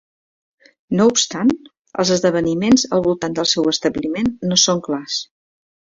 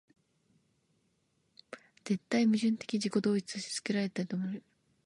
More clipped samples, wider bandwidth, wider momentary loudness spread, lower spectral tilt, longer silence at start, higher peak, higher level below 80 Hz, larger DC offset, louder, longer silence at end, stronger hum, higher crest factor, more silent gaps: neither; second, 7.8 kHz vs 11.5 kHz; second, 9 LU vs 19 LU; second, -3.5 dB/octave vs -5 dB/octave; second, 0.9 s vs 1.7 s; first, -2 dBFS vs -18 dBFS; first, -50 dBFS vs -80 dBFS; neither; first, -17 LUFS vs -33 LUFS; first, 0.75 s vs 0.45 s; neither; about the same, 18 dB vs 18 dB; first, 1.81-1.85 s vs none